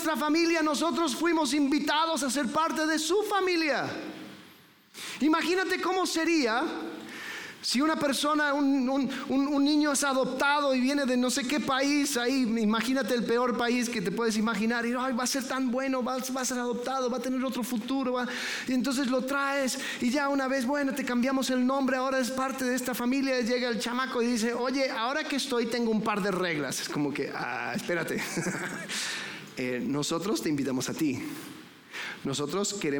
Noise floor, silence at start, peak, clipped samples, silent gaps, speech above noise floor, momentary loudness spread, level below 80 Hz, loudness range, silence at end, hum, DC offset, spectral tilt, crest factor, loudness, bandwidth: -56 dBFS; 0 s; -14 dBFS; under 0.1%; none; 28 dB; 7 LU; -66 dBFS; 5 LU; 0 s; none; under 0.1%; -3.5 dB/octave; 14 dB; -28 LUFS; 19 kHz